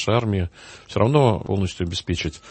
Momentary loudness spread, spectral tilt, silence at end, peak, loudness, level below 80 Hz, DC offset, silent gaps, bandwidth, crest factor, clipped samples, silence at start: 12 LU; -6.5 dB/octave; 0 s; -2 dBFS; -22 LUFS; -42 dBFS; under 0.1%; none; 8.8 kHz; 20 dB; under 0.1%; 0 s